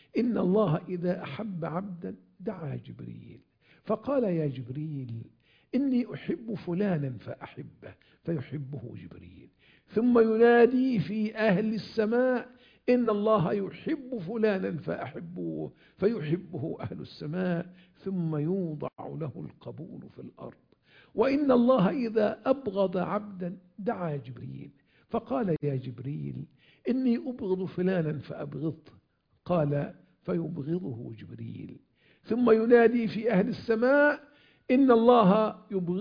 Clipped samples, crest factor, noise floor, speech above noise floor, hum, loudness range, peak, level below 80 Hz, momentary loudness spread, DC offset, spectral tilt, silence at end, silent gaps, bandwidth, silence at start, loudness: under 0.1%; 22 dB; -66 dBFS; 38 dB; none; 9 LU; -8 dBFS; -66 dBFS; 20 LU; under 0.1%; -9.5 dB/octave; 0 s; none; 5.2 kHz; 0.15 s; -28 LUFS